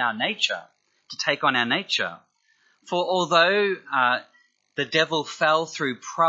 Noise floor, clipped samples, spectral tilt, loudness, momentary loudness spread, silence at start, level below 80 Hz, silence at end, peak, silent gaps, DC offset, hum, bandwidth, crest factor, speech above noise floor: -65 dBFS; under 0.1%; -3 dB/octave; -23 LUFS; 10 LU; 0 s; -80 dBFS; 0 s; -4 dBFS; none; under 0.1%; none; 8 kHz; 20 dB; 41 dB